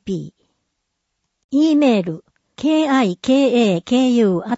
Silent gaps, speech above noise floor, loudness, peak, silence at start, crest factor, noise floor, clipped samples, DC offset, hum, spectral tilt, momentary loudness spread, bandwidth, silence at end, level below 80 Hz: 1.44-1.49 s; 59 dB; -16 LUFS; -4 dBFS; 0.05 s; 14 dB; -75 dBFS; under 0.1%; under 0.1%; none; -6 dB/octave; 13 LU; 8 kHz; 0 s; -60 dBFS